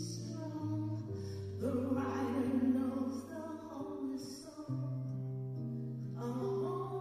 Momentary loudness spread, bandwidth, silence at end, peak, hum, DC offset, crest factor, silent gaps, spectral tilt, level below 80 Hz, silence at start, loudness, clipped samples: 10 LU; 14 kHz; 0 s; -22 dBFS; none; under 0.1%; 16 dB; none; -7.5 dB/octave; -72 dBFS; 0 s; -39 LUFS; under 0.1%